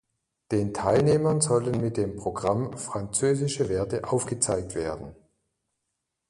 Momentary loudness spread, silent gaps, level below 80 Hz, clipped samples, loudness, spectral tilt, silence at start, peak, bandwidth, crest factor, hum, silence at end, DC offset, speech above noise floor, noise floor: 9 LU; none; -52 dBFS; under 0.1%; -26 LUFS; -5.5 dB/octave; 0.5 s; -8 dBFS; 11.5 kHz; 18 dB; none; 1.15 s; under 0.1%; 56 dB; -82 dBFS